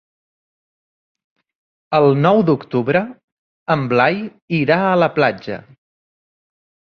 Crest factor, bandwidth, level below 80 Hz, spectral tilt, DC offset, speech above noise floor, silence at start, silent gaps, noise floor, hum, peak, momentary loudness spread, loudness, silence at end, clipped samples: 18 dB; 6.6 kHz; -58 dBFS; -8.5 dB/octave; under 0.1%; over 74 dB; 1.9 s; 3.24-3.66 s, 4.42-4.48 s; under -90 dBFS; none; -2 dBFS; 15 LU; -16 LUFS; 1.25 s; under 0.1%